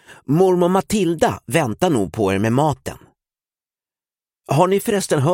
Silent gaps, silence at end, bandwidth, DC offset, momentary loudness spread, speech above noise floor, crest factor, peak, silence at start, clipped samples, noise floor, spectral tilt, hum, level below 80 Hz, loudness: none; 0 s; 17 kHz; under 0.1%; 6 LU; over 73 dB; 18 dB; 0 dBFS; 0.1 s; under 0.1%; under -90 dBFS; -6 dB/octave; none; -50 dBFS; -18 LUFS